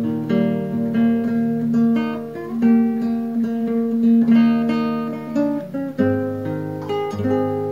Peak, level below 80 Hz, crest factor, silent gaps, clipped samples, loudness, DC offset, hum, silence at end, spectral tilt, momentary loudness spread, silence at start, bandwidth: -6 dBFS; -58 dBFS; 14 dB; none; under 0.1%; -20 LUFS; 0.2%; none; 0 s; -8.5 dB/octave; 10 LU; 0 s; 6.6 kHz